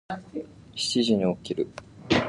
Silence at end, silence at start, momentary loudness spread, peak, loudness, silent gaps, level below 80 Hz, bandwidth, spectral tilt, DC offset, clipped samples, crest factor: 0 s; 0.1 s; 16 LU; -8 dBFS; -27 LUFS; none; -54 dBFS; 11.5 kHz; -4.5 dB/octave; under 0.1%; under 0.1%; 18 dB